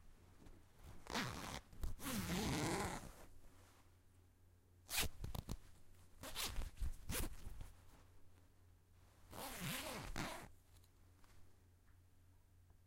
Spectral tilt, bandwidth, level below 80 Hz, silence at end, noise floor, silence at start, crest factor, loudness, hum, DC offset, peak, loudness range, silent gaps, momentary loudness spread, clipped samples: -3.5 dB/octave; 16 kHz; -54 dBFS; 0.1 s; -69 dBFS; 0 s; 24 dB; -46 LUFS; none; under 0.1%; -26 dBFS; 5 LU; none; 24 LU; under 0.1%